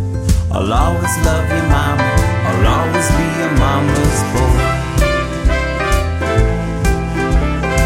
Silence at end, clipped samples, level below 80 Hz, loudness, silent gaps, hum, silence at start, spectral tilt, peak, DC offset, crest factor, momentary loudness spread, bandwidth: 0 s; under 0.1%; -18 dBFS; -15 LUFS; none; none; 0 s; -5.5 dB/octave; 0 dBFS; under 0.1%; 12 dB; 3 LU; 16 kHz